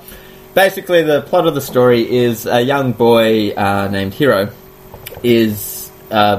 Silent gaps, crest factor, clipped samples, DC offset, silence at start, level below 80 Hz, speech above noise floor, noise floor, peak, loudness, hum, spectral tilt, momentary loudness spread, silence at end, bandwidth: none; 14 dB; under 0.1%; under 0.1%; 0.1 s; -48 dBFS; 23 dB; -36 dBFS; 0 dBFS; -14 LUFS; none; -5.5 dB/octave; 10 LU; 0 s; 15.5 kHz